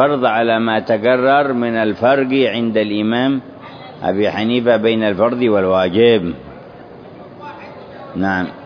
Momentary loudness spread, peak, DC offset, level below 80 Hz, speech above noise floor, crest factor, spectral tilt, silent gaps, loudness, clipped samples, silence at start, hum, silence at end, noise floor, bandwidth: 21 LU; 0 dBFS; under 0.1%; -54 dBFS; 22 dB; 16 dB; -8 dB/octave; none; -15 LUFS; under 0.1%; 0 s; none; 0 s; -36 dBFS; 5.4 kHz